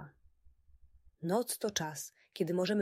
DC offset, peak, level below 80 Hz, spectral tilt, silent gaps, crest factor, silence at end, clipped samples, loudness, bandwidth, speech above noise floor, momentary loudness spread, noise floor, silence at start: under 0.1%; -18 dBFS; -68 dBFS; -4.5 dB/octave; none; 18 dB; 0 s; under 0.1%; -36 LUFS; 16 kHz; 30 dB; 12 LU; -64 dBFS; 0 s